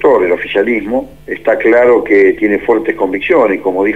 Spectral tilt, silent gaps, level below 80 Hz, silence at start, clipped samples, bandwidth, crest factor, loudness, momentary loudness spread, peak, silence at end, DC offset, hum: -7 dB/octave; none; -44 dBFS; 0 s; under 0.1%; 7.8 kHz; 10 dB; -11 LUFS; 8 LU; 0 dBFS; 0 s; 0.8%; none